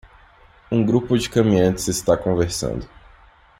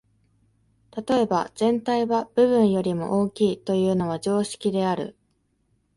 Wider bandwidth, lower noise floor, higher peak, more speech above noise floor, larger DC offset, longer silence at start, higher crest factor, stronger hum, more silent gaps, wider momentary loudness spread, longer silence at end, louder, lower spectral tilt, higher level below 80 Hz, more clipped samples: first, 16 kHz vs 11.5 kHz; second, -50 dBFS vs -69 dBFS; first, -2 dBFS vs -8 dBFS; second, 31 dB vs 46 dB; neither; second, 0.7 s vs 0.95 s; about the same, 18 dB vs 16 dB; neither; neither; about the same, 8 LU vs 6 LU; about the same, 0.75 s vs 0.85 s; first, -20 LUFS vs -23 LUFS; about the same, -5.5 dB/octave vs -6.5 dB/octave; first, -42 dBFS vs -60 dBFS; neither